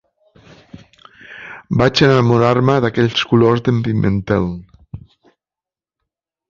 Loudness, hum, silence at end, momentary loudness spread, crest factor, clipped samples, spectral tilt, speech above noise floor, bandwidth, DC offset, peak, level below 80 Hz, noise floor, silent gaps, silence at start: -15 LUFS; none; 1.55 s; 25 LU; 16 dB; under 0.1%; -7 dB/octave; 76 dB; 7.4 kHz; under 0.1%; 0 dBFS; -42 dBFS; -89 dBFS; none; 1.3 s